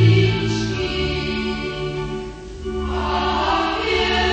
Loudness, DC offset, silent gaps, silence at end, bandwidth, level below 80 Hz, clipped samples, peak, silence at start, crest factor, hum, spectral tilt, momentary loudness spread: -21 LUFS; under 0.1%; none; 0 s; 8.6 kHz; -32 dBFS; under 0.1%; -4 dBFS; 0 s; 16 dB; none; -6 dB/octave; 11 LU